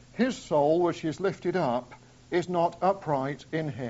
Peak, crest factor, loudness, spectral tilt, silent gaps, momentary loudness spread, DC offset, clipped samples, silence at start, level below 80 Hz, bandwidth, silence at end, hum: -12 dBFS; 16 dB; -28 LUFS; -5.5 dB/octave; none; 8 LU; under 0.1%; under 0.1%; 0.15 s; -62 dBFS; 8 kHz; 0 s; none